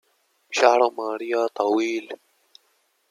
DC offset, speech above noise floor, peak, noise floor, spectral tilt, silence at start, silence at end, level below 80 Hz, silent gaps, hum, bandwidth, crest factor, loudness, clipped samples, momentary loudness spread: under 0.1%; 46 dB; -2 dBFS; -67 dBFS; -2 dB/octave; 0.5 s; 0.95 s; -82 dBFS; none; none; 13.5 kHz; 22 dB; -22 LUFS; under 0.1%; 14 LU